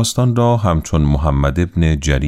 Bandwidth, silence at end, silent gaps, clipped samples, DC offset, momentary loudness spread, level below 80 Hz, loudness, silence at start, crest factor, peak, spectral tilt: 15 kHz; 0 s; none; under 0.1%; under 0.1%; 2 LU; -22 dBFS; -16 LUFS; 0 s; 12 dB; -2 dBFS; -6 dB/octave